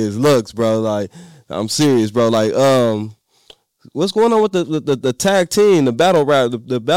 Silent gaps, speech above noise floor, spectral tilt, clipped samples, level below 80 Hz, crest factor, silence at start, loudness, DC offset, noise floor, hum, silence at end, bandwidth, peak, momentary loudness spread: none; 34 dB; -5 dB/octave; under 0.1%; -58 dBFS; 10 dB; 0 s; -15 LUFS; 0.3%; -49 dBFS; none; 0 s; 16.5 kHz; -4 dBFS; 11 LU